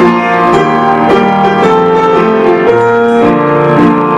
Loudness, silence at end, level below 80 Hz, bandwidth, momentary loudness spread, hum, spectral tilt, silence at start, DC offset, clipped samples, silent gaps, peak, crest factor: -8 LUFS; 0 s; -40 dBFS; 9.6 kHz; 1 LU; none; -7 dB/octave; 0 s; under 0.1%; under 0.1%; none; 0 dBFS; 8 dB